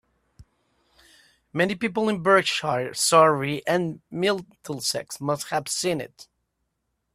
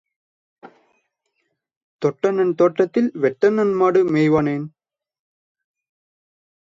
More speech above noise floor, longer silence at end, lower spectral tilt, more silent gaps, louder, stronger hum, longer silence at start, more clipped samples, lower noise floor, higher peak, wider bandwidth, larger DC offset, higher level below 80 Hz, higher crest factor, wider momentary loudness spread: about the same, 53 dB vs 56 dB; second, 0.9 s vs 2.05 s; second, -3.5 dB/octave vs -8 dB/octave; second, none vs 1.77-1.99 s; second, -23 LUFS vs -18 LUFS; neither; second, 0.4 s vs 0.65 s; neither; first, -77 dBFS vs -73 dBFS; about the same, -4 dBFS vs -4 dBFS; first, 15.5 kHz vs 7.6 kHz; neither; about the same, -64 dBFS vs -60 dBFS; about the same, 22 dB vs 18 dB; first, 13 LU vs 8 LU